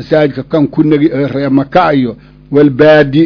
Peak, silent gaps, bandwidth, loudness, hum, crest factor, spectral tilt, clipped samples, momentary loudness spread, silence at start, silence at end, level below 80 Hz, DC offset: 0 dBFS; none; 5.4 kHz; -10 LUFS; none; 10 dB; -9 dB/octave; 2%; 8 LU; 0 s; 0 s; -42 dBFS; under 0.1%